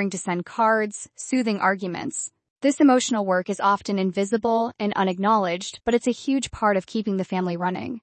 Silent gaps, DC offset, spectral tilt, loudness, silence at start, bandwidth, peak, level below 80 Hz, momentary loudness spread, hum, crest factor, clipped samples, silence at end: 2.50-2.56 s; under 0.1%; -4.5 dB/octave; -23 LUFS; 0 s; 8.8 kHz; -6 dBFS; -58 dBFS; 8 LU; none; 16 dB; under 0.1%; 0.05 s